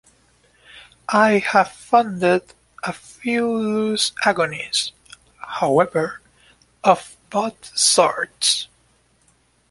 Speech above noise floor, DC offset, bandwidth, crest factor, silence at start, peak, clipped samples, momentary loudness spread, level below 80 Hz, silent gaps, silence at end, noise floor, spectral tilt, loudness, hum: 41 dB; under 0.1%; 11.5 kHz; 20 dB; 0.75 s; -2 dBFS; under 0.1%; 14 LU; -62 dBFS; none; 1.05 s; -60 dBFS; -2.5 dB/octave; -19 LUFS; none